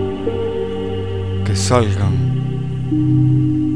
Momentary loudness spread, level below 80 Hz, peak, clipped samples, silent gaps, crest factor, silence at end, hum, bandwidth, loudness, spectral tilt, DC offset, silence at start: 8 LU; -38 dBFS; 0 dBFS; under 0.1%; none; 16 dB; 0 s; none; 10.5 kHz; -18 LUFS; -7 dB/octave; 2%; 0 s